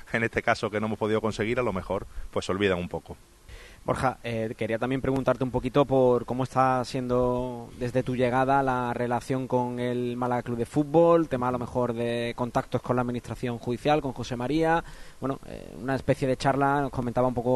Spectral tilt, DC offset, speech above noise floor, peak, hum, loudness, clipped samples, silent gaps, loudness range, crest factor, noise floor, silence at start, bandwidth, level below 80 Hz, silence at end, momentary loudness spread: -6.5 dB/octave; under 0.1%; 20 dB; -6 dBFS; none; -27 LUFS; under 0.1%; none; 4 LU; 20 dB; -47 dBFS; 0.05 s; 12.5 kHz; -48 dBFS; 0 s; 10 LU